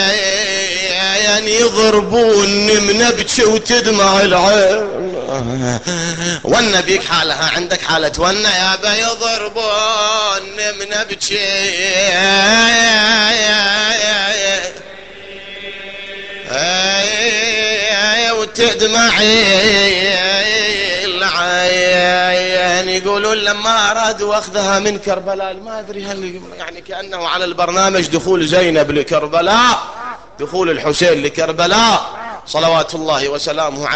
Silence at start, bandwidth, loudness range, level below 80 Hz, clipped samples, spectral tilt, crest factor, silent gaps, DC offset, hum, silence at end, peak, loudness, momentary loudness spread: 0 s; 9 kHz; 6 LU; -44 dBFS; under 0.1%; -2 dB/octave; 14 dB; none; 0.8%; none; 0 s; 0 dBFS; -12 LUFS; 15 LU